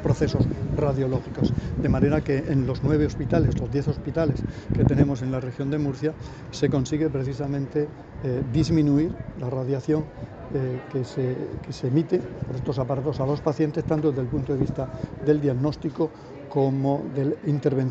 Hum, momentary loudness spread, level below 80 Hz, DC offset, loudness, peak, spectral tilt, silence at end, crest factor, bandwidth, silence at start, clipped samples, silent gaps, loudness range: none; 8 LU; -40 dBFS; under 0.1%; -25 LUFS; -6 dBFS; -8.5 dB/octave; 0 s; 20 dB; 8 kHz; 0 s; under 0.1%; none; 3 LU